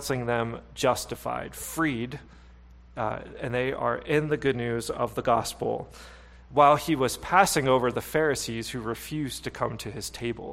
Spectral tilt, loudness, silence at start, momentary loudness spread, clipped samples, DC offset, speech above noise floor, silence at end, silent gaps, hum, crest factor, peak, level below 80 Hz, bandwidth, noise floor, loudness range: -4.5 dB/octave; -27 LUFS; 0 s; 13 LU; under 0.1%; under 0.1%; 23 dB; 0 s; none; none; 24 dB; -4 dBFS; -50 dBFS; 16 kHz; -50 dBFS; 6 LU